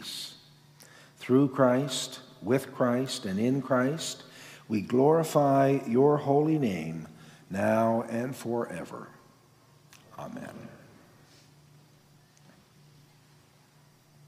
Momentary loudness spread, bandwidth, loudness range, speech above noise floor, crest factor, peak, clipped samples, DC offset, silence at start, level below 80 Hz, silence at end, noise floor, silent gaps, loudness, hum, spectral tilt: 19 LU; 15.5 kHz; 23 LU; 34 dB; 20 dB; -10 dBFS; under 0.1%; under 0.1%; 0 s; -72 dBFS; 3.5 s; -60 dBFS; none; -27 LUFS; none; -6 dB/octave